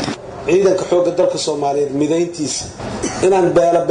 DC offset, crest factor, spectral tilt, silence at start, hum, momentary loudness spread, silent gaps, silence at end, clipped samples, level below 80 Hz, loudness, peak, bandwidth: under 0.1%; 12 dB; -4.5 dB/octave; 0 s; none; 10 LU; none; 0 s; under 0.1%; -44 dBFS; -16 LUFS; -4 dBFS; 10.5 kHz